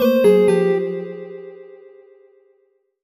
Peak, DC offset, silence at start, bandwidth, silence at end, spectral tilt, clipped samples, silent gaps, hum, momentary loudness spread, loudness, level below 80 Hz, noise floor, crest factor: -4 dBFS; under 0.1%; 0 s; 15 kHz; 1.4 s; -7 dB/octave; under 0.1%; none; none; 22 LU; -16 LUFS; -66 dBFS; -63 dBFS; 16 dB